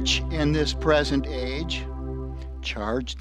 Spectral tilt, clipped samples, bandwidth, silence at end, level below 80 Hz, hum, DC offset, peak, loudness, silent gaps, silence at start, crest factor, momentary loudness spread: -5 dB/octave; under 0.1%; 10.5 kHz; 0 s; -32 dBFS; none; under 0.1%; -6 dBFS; -26 LUFS; none; 0 s; 18 dB; 12 LU